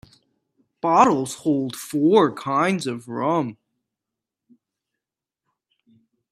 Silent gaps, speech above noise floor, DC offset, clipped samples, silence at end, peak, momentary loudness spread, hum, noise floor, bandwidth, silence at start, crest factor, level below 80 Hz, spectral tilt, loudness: none; 67 dB; under 0.1%; under 0.1%; 2.8 s; -2 dBFS; 11 LU; none; -87 dBFS; 15 kHz; 0.85 s; 22 dB; -68 dBFS; -5.5 dB/octave; -21 LUFS